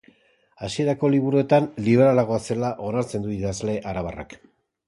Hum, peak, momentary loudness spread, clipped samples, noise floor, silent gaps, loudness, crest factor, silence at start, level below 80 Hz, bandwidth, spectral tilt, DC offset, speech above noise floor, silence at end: none; -6 dBFS; 13 LU; under 0.1%; -60 dBFS; none; -22 LUFS; 18 dB; 0.6 s; -50 dBFS; 11.5 kHz; -7 dB/octave; under 0.1%; 38 dB; 0.5 s